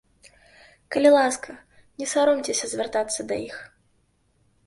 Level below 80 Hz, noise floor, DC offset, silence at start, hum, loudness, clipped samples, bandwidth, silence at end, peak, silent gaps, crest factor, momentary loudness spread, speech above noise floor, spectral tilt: -64 dBFS; -66 dBFS; under 0.1%; 0.9 s; none; -23 LUFS; under 0.1%; 11.5 kHz; 1 s; -6 dBFS; none; 20 dB; 17 LU; 43 dB; -2.5 dB/octave